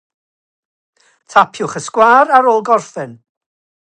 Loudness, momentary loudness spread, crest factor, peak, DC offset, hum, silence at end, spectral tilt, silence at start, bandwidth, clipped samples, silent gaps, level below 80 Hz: -12 LUFS; 18 LU; 16 dB; 0 dBFS; under 0.1%; none; 0.75 s; -4 dB/octave; 1.35 s; 9.8 kHz; under 0.1%; none; -62 dBFS